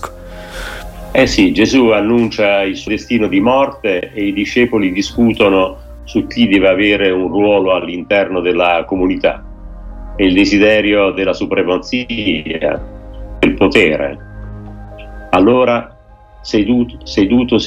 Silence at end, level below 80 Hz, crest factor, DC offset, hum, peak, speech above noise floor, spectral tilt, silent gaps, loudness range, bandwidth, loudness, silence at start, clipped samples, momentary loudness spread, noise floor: 0 s; -34 dBFS; 14 dB; under 0.1%; none; 0 dBFS; 27 dB; -5.5 dB/octave; none; 3 LU; 13 kHz; -13 LUFS; 0 s; under 0.1%; 20 LU; -40 dBFS